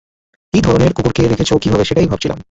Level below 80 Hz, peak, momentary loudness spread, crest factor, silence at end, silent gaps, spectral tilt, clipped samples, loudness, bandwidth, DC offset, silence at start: -32 dBFS; 0 dBFS; 4 LU; 14 dB; 0.1 s; none; -6.5 dB/octave; under 0.1%; -14 LUFS; 8.2 kHz; under 0.1%; 0.55 s